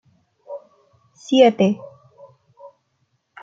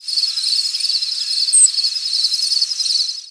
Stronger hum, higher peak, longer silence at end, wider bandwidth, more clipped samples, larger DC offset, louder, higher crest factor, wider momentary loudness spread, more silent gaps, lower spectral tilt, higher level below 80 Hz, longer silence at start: neither; about the same, -2 dBFS vs -2 dBFS; first, 0.75 s vs 0 s; second, 7.6 kHz vs 11 kHz; neither; neither; second, -17 LUFS vs -14 LUFS; first, 22 dB vs 16 dB; first, 23 LU vs 7 LU; neither; first, -6 dB/octave vs 7.5 dB/octave; first, -70 dBFS vs -80 dBFS; first, 0.5 s vs 0 s